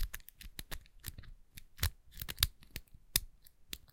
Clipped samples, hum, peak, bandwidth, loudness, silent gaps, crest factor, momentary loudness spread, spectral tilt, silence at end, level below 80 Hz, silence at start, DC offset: under 0.1%; none; -8 dBFS; 17 kHz; -39 LUFS; none; 34 dB; 22 LU; -1.5 dB/octave; 0.1 s; -48 dBFS; 0 s; under 0.1%